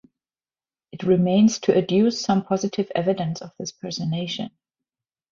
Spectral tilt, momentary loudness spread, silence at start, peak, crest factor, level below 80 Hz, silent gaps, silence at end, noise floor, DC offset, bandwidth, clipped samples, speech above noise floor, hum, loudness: -6 dB/octave; 13 LU; 0.95 s; -4 dBFS; 18 dB; -62 dBFS; none; 0.85 s; under -90 dBFS; under 0.1%; 7.4 kHz; under 0.1%; over 69 dB; none; -22 LUFS